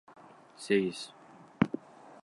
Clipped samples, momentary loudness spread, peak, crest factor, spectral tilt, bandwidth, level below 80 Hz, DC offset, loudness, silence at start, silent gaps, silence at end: under 0.1%; 18 LU; -10 dBFS; 26 dB; -6 dB/octave; 11.5 kHz; -68 dBFS; under 0.1%; -32 LUFS; 0.6 s; none; 0.45 s